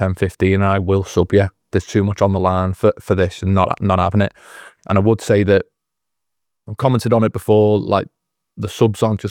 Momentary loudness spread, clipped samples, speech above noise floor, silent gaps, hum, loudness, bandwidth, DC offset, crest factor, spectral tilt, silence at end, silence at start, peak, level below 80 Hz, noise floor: 6 LU; under 0.1%; 66 dB; none; none; -17 LUFS; 14.5 kHz; under 0.1%; 16 dB; -7.5 dB/octave; 0 s; 0 s; 0 dBFS; -48 dBFS; -82 dBFS